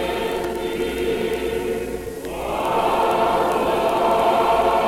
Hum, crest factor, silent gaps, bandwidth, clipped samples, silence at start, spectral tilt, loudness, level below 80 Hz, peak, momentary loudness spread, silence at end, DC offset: none; 12 dB; none; 17 kHz; under 0.1%; 0 s; -4.5 dB/octave; -21 LUFS; -42 dBFS; -8 dBFS; 9 LU; 0 s; under 0.1%